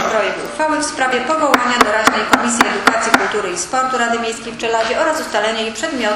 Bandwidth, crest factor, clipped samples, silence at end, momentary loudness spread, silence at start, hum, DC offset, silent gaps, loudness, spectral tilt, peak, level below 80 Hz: 15 kHz; 16 dB; 0.2%; 0 s; 7 LU; 0 s; none; under 0.1%; none; -15 LUFS; -2 dB/octave; 0 dBFS; -48 dBFS